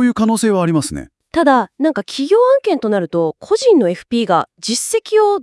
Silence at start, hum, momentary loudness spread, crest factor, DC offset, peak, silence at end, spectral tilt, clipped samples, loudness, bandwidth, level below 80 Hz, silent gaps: 0 s; none; 7 LU; 14 dB; under 0.1%; 0 dBFS; 0 s; -5 dB/octave; under 0.1%; -15 LUFS; 12 kHz; -50 dBFS; none